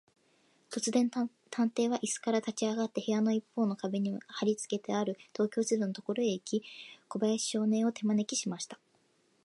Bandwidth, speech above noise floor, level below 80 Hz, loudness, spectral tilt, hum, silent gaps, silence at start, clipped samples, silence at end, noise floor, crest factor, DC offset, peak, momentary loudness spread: 11.5 kHz; 39 dB; -84 dBFS; -33 LUFS; -4.5 dB/octave; none; none; 0.7 s; under 0.1%; 0.7 s; -71 dBFS; 16 dB; under 0.1%; -16 dBFS; 7 LU